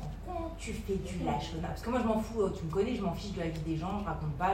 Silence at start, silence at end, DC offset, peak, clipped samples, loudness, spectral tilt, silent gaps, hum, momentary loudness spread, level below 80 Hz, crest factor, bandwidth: 0 s; 0 s; under 0.1%; -16 dBFS; under 0.1%; -35 LUFS; -6.5 dB/octave; none; none; 8 LU; -44 dBFS; 16 dB; 16 kHz